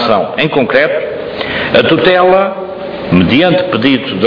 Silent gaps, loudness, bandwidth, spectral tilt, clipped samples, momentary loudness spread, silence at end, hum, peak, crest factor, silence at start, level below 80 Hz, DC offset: none; -10 LUFS; 5.4 kHz; -8 dB/octave; 0.2%; 11 LU; 0 s; none; 0 dBFS; 10 dB; 0 s; -42 dBFS; under 0.1%